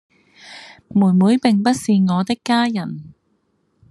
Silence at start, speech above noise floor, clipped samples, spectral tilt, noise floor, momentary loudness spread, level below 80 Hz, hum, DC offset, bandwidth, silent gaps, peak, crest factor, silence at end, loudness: 0.45 s; 49 dB; under 0.1%; -6.5 dB/octave; -65 dBFS; 23 LU; -62 dBFS; none; under 0.1%; 12.5 kHz; none; -2 dBFS; 16 dB; 0.8 s; -17 LUFS